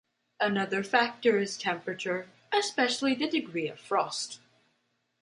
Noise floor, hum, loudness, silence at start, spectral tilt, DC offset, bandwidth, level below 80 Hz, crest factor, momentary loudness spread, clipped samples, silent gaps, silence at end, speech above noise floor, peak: -76 dBFS; none; -29 LUFS; 0.4 s; -3.5 dB/octave; under 0.1%; 11.5 kHz; -78 dBFS; 20 dB; 9 LU; under 0.1%; none; 0.85 s; 47 dB; -10 dBFS